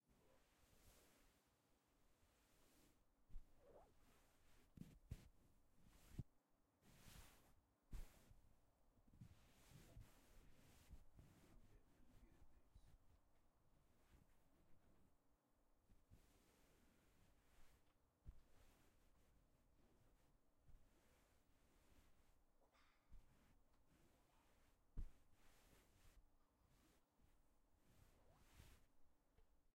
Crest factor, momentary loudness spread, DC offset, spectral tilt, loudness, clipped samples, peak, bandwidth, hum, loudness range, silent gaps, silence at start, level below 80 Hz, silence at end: 28 dB; 8 LU; under 0.1%; -5 dB/octave; -65 LUFS; under 0.1%; -40 dBFS; 16 kHz; none; 3 LU; none; 0.05 s; -70 dBFS; 0.05 s